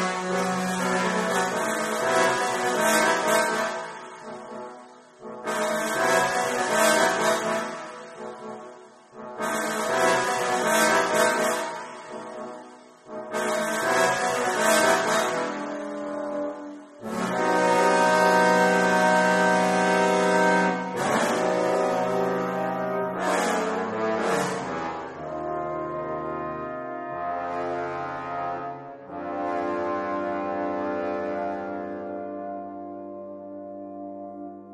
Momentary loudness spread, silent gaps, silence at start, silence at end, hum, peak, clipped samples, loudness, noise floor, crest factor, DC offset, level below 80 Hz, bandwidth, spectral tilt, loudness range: 18 LU; none; 0 s; 0 s; none; -8 dBFS; under 0.1%; -24 LUFS; -47 dBFS; 18 dB; under 0.1%; -64 dBFS; 15.5 kHz; -3.5 dB/octave; 10 LU